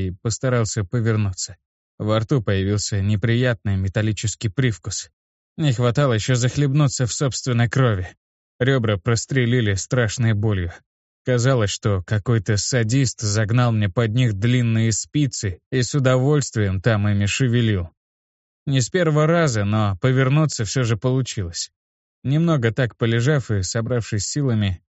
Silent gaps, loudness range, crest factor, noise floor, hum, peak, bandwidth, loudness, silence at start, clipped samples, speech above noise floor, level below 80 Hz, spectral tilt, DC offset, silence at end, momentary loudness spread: 1.65-1.98 s, 5.13-5.56 s, 8.17-8.59 s, 10.86-11.25 s, 15.66-15.71 s, 17.97-18.66 s, 21.76-22.22 s; 2 LU; 16 dB; under -90 dBFS; none; -4 dBFS; 8.2 kHz; -20 LUFS; 0 s; under 0.1%; over 70 dB; -48 dBFS; -5.5 dB/octave; under 0.1%; 0.15 s; 7 LU